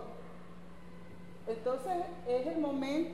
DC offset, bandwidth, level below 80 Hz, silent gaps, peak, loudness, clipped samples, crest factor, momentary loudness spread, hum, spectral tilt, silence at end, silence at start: 0.4%; 13.5 kHz; -64 dBFS; none; -24 dBFS; -36 LUFS; under 0.1%; 14 dB; 19 LU; none; -6.5 dB/octave; 0 s; 0 s